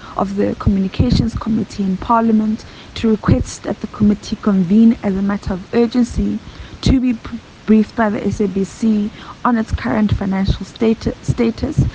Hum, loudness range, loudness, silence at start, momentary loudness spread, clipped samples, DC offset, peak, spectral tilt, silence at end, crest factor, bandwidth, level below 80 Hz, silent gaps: none; 2 LU; -17 LUFS; 0 s; 9 LU; under 0.1%; under 0.1%; -2 dBFS; -7.5 dB/octave; 0 s; 14 dB; 8.8 kHz; -30 dBFS; none